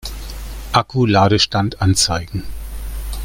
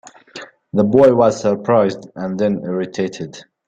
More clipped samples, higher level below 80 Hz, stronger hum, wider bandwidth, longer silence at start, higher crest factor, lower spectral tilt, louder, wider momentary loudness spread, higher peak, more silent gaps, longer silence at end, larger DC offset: neither; first, -30 dBFS vs -56 dBFS; neither; first, 17 kHz vs 8.6 kHz; second, 0.05 s vs 0.35 s; about the same, 18 dB vs 16 dB; second, -4.5 dB/octave vs -7 dB/octave; about the same, -16 LUFS vs -16 LUFS; second, 18 LU vs 23 LU; about the same, 0 dBFS vs 0 dBFS; neither; second, 0 s vs 0.25 s; neither